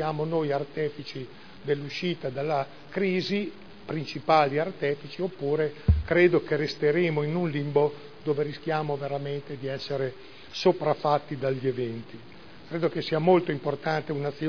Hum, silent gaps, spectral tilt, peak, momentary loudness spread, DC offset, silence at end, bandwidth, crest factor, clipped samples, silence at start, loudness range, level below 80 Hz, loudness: none; none; -7.5 dB/octave; -8 dBFS; 14 LU; 0.4%; 0 s; 5.4 kHz; 20 dB; under 0.1%; 0 s; 5 LU; -42 dBFS; -27 LUFS